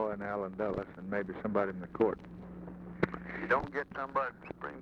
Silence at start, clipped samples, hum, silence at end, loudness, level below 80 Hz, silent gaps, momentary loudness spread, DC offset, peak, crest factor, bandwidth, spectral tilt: 0 s; under 0.1%; none; 0 s; -35 LUFS; -58 dBFS; none; 14 LU; under 0.1%; -14 dBFS; 20 dB; 7.6 kHz; -8.5 dB/octave